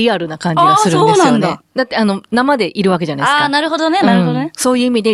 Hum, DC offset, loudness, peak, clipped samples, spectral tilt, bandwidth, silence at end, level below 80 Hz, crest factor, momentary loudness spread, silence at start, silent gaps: none; under 0.1%; -13 LUFS; 0 dBFS; under 0.1%; -5 dB/octave; 13.5 kHz; 0 s; -56 dBFS; 12 dB; 7 LU; 0 s; none